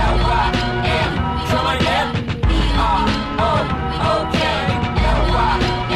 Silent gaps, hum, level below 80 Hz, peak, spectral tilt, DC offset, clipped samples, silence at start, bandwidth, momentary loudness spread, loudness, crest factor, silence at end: none; none; -24 dBFS; -4 dBFS; -6 dB/octave; under 0.1%; under 0.1%; 0 s; 13.5 kHz; 3 LU; -18 LUFS; 12 dB; 0 s